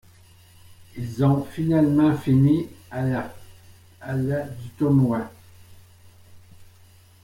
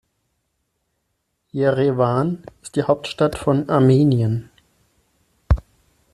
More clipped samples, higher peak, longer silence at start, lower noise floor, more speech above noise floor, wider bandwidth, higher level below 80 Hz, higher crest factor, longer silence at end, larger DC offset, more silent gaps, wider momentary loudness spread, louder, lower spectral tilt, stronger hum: neither; second, -8 dBFS vs -4 dBFS; second, 0.7 s vs 1.55 s; second, -52 dBFS vs -73 dBFS; second, 31 dB vs 55 dB; first, 16 kHz vs 12 kHz; second, -54 dBFS vs -36 dBFS; about the same, 18 dB vs 18 dB; about the same, 0.6 s vs 0.55 s; neither; neither; first, 17 LU vs 11 LU; second, -22 LUFS vs -19 LUFS; about the same, -9 dB/octave vs -8 dB/octave; neither